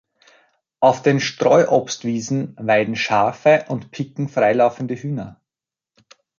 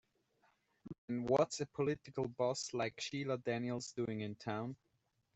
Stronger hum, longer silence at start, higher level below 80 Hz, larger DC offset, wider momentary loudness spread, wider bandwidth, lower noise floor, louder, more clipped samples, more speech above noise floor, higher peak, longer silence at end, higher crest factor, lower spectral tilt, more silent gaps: neither; about the same, 0.8 s vs 0.85 s; first, -62 dBFS vs -74 dBFS; neither; about the same, 12 LU vs 10 LU; about the same, 7.6 kHz vs 8.2 kHz; first, -89 dBFS vs -81 dBFS; first, -19 LUFS vs -39 LUFS; neither; first, 71 dB vs 42 dB; first, -2 dBFS vs -20 dBFS; first, 1.1 s vs 0.6 s; about the same, 18 dB vs 22 dB; about the same, -5.5 dB/octave vs -5 dB/octave; second, none vs 0.98-1.08 s